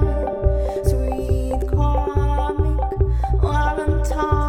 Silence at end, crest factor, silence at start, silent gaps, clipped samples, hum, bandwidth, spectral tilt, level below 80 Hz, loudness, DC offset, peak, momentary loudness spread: 0 s; 14 dB; 0 s; none; under 0.1%; none; 11.5 kHz; -7.5 dB/octave; -20 dBFS; -21 LUFS; under 0.1%; -4 dBFS; 2 LU